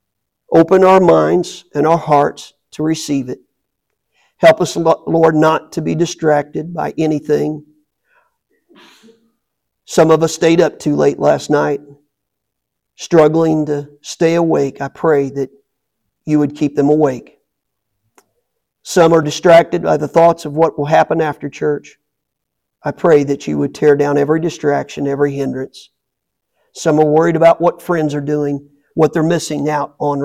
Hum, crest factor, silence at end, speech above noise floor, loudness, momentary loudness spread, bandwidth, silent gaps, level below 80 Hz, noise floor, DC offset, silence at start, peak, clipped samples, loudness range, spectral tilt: none; 14 dB; 0 s; 63 dB; -14 LUFS; 11 LU; 14.5 kHz; none; -54 dBFS; -76 dBFS; under 0.1%; 0.5 s; 0 dBFS; under 0.1%; 5 LU; -6 dB/octave